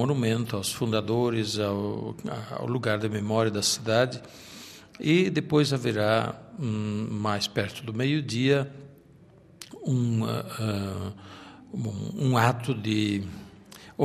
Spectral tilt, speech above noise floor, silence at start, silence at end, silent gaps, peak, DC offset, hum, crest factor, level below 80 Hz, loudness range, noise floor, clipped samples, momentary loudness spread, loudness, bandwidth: -5.5 dB/octave; 27 dB; 0 s; 0 s; none; -6 dBFS; under 0.1%; none; 22 dB; -64 dBFS; 4 LU; -54 dBFS; under 0.1%; 19 LU; -27 LUFS; 14.5 kHz